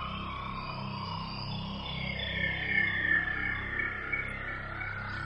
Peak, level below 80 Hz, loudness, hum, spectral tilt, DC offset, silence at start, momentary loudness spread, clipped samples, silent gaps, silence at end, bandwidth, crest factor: -16 dBFS; -48 dBFS; -32 LUFS; none; -6 dB/octave; under 0.1%; 0 s; 10 LU; under 0.1%; none; 0 s; 10.5 kHz; 18 dB